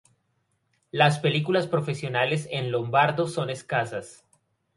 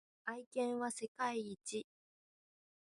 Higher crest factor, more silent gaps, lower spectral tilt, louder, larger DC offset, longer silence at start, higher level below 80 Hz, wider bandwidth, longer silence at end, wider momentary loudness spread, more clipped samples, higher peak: about the same, 20 dB vs 18 dB; second, none vs 0.46-0.51 s, 1.08-1.15 s; first, -5.5 dB/octave vs -3 dB/octave; first, -25 LUFS vs -42 LUFS; neither; first, 0.95 s vs 0.25 s; first, -66 dBFS vs -88 dBFS; about the same, 11.5 kHz vs 11.5 kHz; second, 0.65 s vs 1.15 s; about the same, 8 LU vs 8 LU; neither; first, -6 dBFS vs -26 dBFS